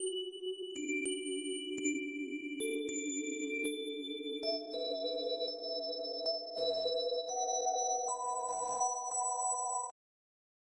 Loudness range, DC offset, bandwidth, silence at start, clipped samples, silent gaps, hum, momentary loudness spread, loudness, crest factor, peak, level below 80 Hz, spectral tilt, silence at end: 3 LU; under 0.1%; 11.5 kHz; 0 s; under 0.1%; none; none; 6 LU; -36 LUFS; 16 dB; -22 dBFS; -86 dBFS; 0 dB/octave; 0.75 s